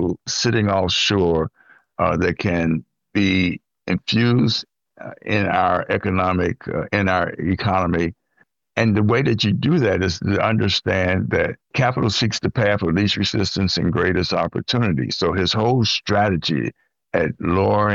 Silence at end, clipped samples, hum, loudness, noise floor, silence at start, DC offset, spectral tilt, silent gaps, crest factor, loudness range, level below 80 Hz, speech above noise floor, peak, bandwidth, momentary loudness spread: 0 s; under 0.1%; none; -20 LUFS; -62 dBFS; 0 s; under 0.1%; -5.5 dB/octave; none; 18 dB; 2 LU; -44 dBFS; 43 dB; -2 dBFS; 7.6 kHz; 6 LU